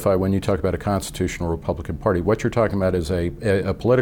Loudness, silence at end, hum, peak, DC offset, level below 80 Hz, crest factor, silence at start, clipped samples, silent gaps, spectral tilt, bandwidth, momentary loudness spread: -22 LUFS; 0 s; none; -6 dBFS; under 0.1%; -38 dBFS; 16 dB; 0 s; under 0.1%; none; -6.5 dB/octave; 17.5 kHz; 5 LU